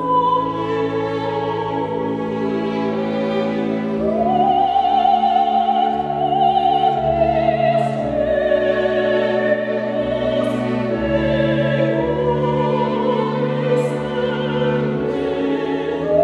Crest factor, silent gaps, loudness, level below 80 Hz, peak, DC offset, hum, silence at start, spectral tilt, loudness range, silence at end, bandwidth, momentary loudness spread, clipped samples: 14 dB; none; -18 LUFS; -42 dBFS; -4 dBFS; under 0.1%; none; 0 s; -7.5 dB/octave; 4 LU; 0 s; 11 kHz; 6 LU; under 0.1%